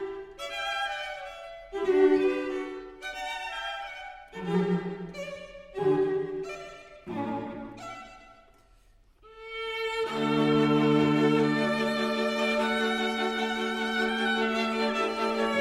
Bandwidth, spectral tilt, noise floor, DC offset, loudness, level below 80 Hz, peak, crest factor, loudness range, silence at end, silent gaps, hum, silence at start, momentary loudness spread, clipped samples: 15 kHz; -5.5 dB/octave; -60 dBFS; under 0.1%; -28 LUFS; -60 dBFS; -12 dBFS; 18 dB; 10 LU; 0 s; none; none; 0 s; 17 LU; under 0.1%